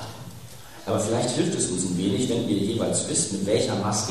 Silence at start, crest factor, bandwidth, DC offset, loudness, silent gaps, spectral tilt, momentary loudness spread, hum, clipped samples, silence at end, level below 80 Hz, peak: 0 s; 18 dB; 14.5 kHz; 0.4%; -24 LUFS; none; -4.5 dB/octave; 16 LU; none; under 0.1%; 0 s; -56 dBFS; -8 dBFS